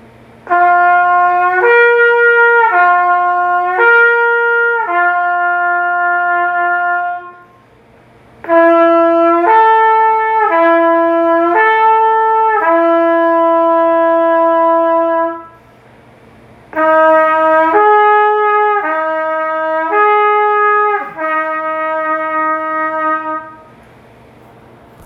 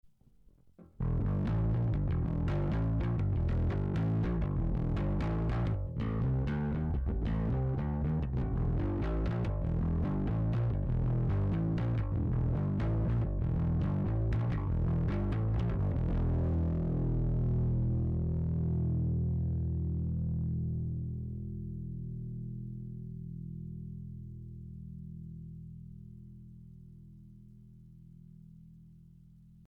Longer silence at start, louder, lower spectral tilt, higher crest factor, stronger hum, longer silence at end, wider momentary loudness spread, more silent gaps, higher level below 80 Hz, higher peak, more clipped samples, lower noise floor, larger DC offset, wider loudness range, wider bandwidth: second, 0.45 s vs 0.8 s; first, -11 LUFS vs -33 LUFS; second, -6 dB/octave vs -10.5 dB/octave; about the same, 10 dB vs 8 dB; neither; first, 1.5 s vs 0.15 s; second, 8 LU vs 14 LU; neither; second, -60 dBFS vs -38 dBFS; first, 0 dBFS vs -26 dBFS; neither; second, -44 dBFS vs -62 dBFS; neither; second, 5 LU vs 14 LU; about the same, 5.2 kHz vs 4.9 kHz